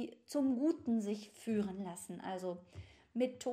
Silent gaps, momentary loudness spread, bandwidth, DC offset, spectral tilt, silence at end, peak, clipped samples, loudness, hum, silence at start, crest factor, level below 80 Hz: none; 12 LU; 15 kHz; under 0.1%; -6 dB/octave; 0 s; -22 dBFS; under 0.1%; -39 LUFS; none; 0 s; 16 dB; -72 dBFS